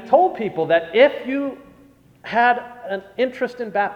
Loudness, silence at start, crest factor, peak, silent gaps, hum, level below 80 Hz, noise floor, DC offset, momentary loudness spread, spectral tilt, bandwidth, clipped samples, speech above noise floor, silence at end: -20 LUFS; 0 s; 18 dB; -2 dBFS; none; none; -62 dBFS; -51 dBFS; under 0.1%; 13 LU; -6 dB/octave; 7 kHz; under 0.1%; 31 dB; 0 s